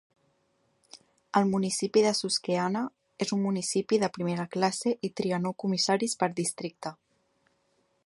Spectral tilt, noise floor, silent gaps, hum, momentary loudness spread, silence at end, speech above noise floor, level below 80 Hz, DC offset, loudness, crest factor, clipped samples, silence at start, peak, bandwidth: -4.5 dB/octave; -72 dBFS; none; none; 8 LU; 1.15 s; 44 dB; -72 dBFS; under 0.1%; -28 LUFS; 22 dB; under 0.1%; 0.95 s; -8 dBFS; 11.5 kHz